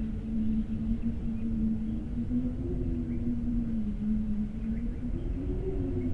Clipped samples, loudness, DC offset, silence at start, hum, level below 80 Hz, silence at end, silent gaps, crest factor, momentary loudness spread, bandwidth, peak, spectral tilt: under 0.1%; -33 LUFS; under 0.1%; 0 s; none; -36 dBFS; 0 s; none; 12 dB; 4 LU; 4.2 kHz; -18 dBFS; -10.5 dB/octave